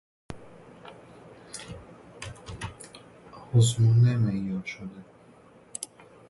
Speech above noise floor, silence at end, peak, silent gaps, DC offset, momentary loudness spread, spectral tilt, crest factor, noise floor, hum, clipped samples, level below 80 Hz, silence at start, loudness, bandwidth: 31 dB; 0.45 s; -10 dBFS; none; under 0.1%; 28 LU; -6 dB/octave; 18 dB; -54 dBFS; none; under 0.1%; -56 dBFS; 0.3 s; -26 LUFS; 11.5 kHz